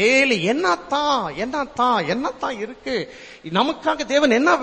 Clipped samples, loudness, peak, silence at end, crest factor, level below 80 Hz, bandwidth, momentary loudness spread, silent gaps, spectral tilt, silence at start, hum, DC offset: under 0.1%; -20 LUFS; -4 dBFS; 0 s; 16 dB; -54 dBFS; 8.8 kHz; 11 LU; none; -4 dB/octave; 0 s; none; under 0.1%